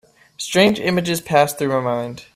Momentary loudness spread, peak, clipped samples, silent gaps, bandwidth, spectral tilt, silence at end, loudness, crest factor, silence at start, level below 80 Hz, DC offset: 8 LU; -2 dBFS; under 0.1%; none; 16 kHz; -4.5 dB/octave; 0.1 s; -18 LUFS; 18 dB; 0.4 s; -56 dBFS; under 0.1%